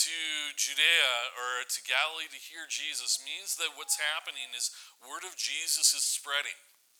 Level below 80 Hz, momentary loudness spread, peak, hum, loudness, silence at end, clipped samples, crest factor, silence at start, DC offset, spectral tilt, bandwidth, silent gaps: under -90 dBFS; 15 LU; -10 dBFS; none; -29 LUFS; 0.4 s; under 0.1%; 22 dB; 0 s; under 0.1%; 5.5 dB/octave; over 20 kHz; none